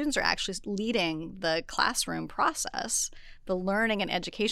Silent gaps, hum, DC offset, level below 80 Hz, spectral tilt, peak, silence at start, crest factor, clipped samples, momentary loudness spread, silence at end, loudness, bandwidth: none; none; under 0.1%; -50 dBFS; -2.5 dB/octave; -6 dBFS; 0 s; 22 dB; under 0.1%; 6 LU; 0 s; -29 LUFS; 16 kHz